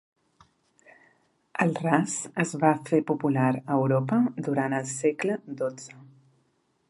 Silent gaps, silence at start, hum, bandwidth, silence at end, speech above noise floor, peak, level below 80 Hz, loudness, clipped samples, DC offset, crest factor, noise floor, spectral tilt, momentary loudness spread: none; 1.55 s; none; 11.5 kHz; 0.85 s; 45 dB; -6 dBFS; -74 dBFS; -26 LUFS; under 0.1%; under 0.1%; 22 dB; -70 dBFS; -6.5 dB/octave; 9 LU